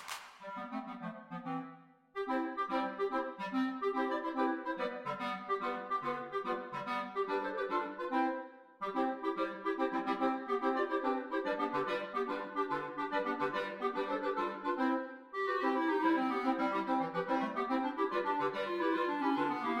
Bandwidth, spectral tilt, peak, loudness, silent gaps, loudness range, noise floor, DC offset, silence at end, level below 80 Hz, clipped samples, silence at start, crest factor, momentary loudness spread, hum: 15 kHz; -5.5 dB/octave; -18 dBFS; -36 LUFS; none; 4 LU; -56 dBFS; under 0.1%; 0 s; -76 dBFS; under 0.1%; 0 s; 16 dB; 9 LU; none